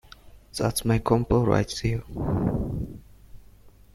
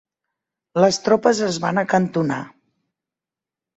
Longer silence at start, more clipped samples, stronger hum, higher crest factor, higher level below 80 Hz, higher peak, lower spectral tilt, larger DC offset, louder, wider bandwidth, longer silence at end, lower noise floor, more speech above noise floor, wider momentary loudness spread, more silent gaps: second, 0.25 s vs 0.75 s; neither; first, 50 Hz at -45 dBFS vs none; about the same, 20 dB vs 20 dB; first, -40 dBFS vs -62 dBFS; second, -6 dBFS vs -2 dBFS; about the same, -6 dB/octave vs -5 dB/octave; neither; second, -25 LUFS vs -19 LUFS; first, 15 kHz vs 8.2 kHz; second, 0.25 s vs 1.3 s; second, -51 dBFS vs -88 dBFS; second, 27 dB vs 70 dB; first, 13 LU vs 10 LU; neither